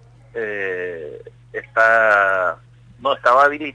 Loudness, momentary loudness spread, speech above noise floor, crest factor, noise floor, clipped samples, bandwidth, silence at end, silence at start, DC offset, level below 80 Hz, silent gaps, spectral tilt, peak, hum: -17 LUFS; 19 LU; 21 dB; 16 dB; -37 dBFS; under 0.1%; 10 kHz; 0.05 s; 0.35 s; under 0.1%; -56 dBFS; none; -4.5 dB/octave; -4 dBFS; none